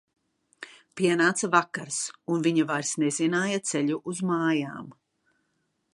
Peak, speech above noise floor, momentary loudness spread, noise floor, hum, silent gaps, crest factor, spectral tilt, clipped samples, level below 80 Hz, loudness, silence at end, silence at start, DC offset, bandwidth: -6 dBFS; 49 dB; 17 LU; -75 dBFS; none; none; 22 dB; -4 dB/octave; under 0.1%; -76 dBFS; -26 LUFS; 1 s; 0.6 s; under 0.1%; 11.5 kHz